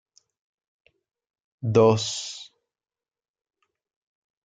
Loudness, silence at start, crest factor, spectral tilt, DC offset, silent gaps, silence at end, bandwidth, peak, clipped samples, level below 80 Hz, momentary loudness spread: -22 LUFS; 1.65 s; 24 dB; -5.5 dB/octave; under 0.1%; none; 2 s; 9.4 kHz; -6 dBFS; under 0.1%; -68 dBFS; 17 LU